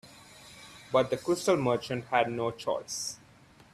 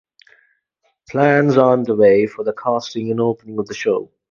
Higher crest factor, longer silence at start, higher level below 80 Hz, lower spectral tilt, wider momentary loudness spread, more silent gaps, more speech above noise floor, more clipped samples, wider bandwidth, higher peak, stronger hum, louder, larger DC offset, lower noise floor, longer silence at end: about the same, 22 dB vs 18 dB; second, 0.05 s vs 1.1 s; second, -66 dBFS vs -60 dBFS; second, -4.5 dB/octave vs -7 dB/octave; first, 21 LU vs 10 LU; neither; second, 28 dB vs 51 dB; neither; first, 15 kHz vs 7.2 kHz; second, -10 dBFS vs 0 dBFS; neither; second, -30 LUFS vs -17 LUFS; neither; second, -57 dBFS vs -67 dBFS; first, 0.55 s vs 0.25 s